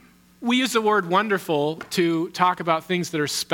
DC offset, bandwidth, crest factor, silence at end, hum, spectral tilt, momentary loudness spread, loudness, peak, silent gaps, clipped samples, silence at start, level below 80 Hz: under 0.1%; 18 kHz; 20 dB; 0 s; none; -4 dB/octave; 5 LU; -22 LUFS; -2 dBFS; none; under 0.1%; 0.4 s; -68 dBFS